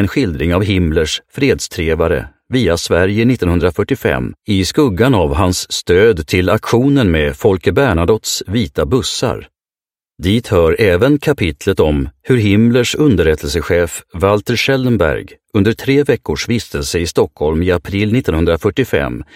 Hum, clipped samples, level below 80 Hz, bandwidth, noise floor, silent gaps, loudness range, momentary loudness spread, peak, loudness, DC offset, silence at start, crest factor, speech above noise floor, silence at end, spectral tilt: none; under 0.1%; -30 dBFS; 16.5 kHz; under -90 dBFS; none; 3 LU; 6 LU; 0 dBFS; -14 LUFS; under 0.1%; 0 s; 14 dB; over 77 dB; 0.1 s; -5.5 dB/octave